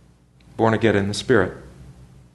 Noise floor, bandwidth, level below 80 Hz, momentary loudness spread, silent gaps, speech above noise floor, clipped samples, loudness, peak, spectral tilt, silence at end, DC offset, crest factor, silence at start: -52 dBFS; 12 kHz; -50 dBFS; 18 LU; none; 33 dB; under 0.1%; -20 LUFS; -2 dBFS; -6 dB/octave; 0.45 s; under 0.1%; 20 dB; 0.55 s